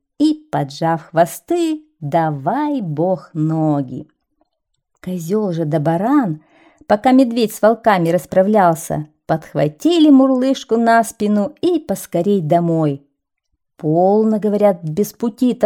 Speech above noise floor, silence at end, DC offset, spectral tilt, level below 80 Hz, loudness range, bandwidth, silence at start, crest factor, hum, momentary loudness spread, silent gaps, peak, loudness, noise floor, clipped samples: 57 dB; 0 s; under 0.1%; -6.5 dB/octave; -58 dBFS; 6 LU; 18 kHz; 0.2 s; 14 dB; none; 9 LU; none; -2 dBFS; -16 LUFS; -73 dBFS; under 0.1%